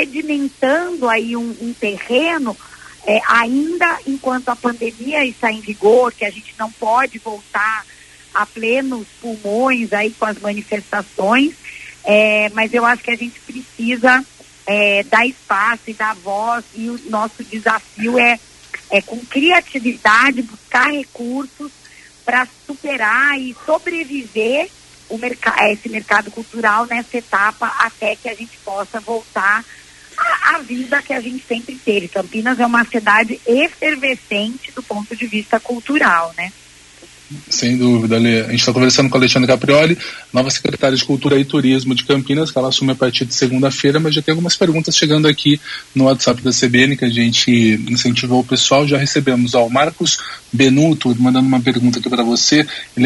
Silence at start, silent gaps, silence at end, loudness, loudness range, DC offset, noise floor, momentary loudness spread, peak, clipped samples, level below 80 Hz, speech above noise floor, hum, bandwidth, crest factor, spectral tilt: 0 s; none; 0 s; -15 LUFS; 5 LU; under 0.1%; -42 dBFS; 12 LU; 0 dBFS; under 0.1%; -54 dBFS; 27 dB; none; 11.5 kHz; 16 dB; -4 dB/octave